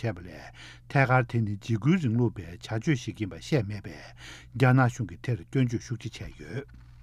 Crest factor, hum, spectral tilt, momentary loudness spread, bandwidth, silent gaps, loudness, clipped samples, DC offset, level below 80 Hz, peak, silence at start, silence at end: 20 dB; none; -7 dB/octave; 21 LU; 10.5 kHz; none; -28 LUFS; under 0.1%; under 0.1%; -52 dBFS; -8 dBFS; 0 s; 0 s